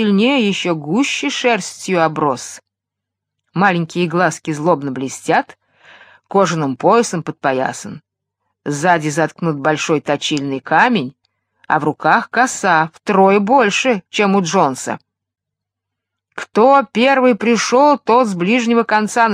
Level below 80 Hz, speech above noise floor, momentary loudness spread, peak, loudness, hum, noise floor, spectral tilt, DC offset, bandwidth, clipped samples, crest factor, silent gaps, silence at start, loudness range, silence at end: -66 dBFS; 67 dB; 11 LU; 0 dBFS; -15 LUFS; none; -81 dBFS; -4.5 dB/octave; under 0.1%; 14.5 kHz; under 0.1%; 16 dB; none; 0 s; 4 LU; 0 s